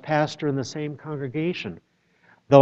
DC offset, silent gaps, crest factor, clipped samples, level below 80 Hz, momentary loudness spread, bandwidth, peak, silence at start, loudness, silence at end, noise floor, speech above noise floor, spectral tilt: under 0.1%; none; 22 dB; under 0.1%; -64 dBFS; 11 LU; 8 kHz; -2 dBFS; 0.05 s; -26 LUFS; 0 s; -60 dBFS; 33 dB; -6.5 dB/octave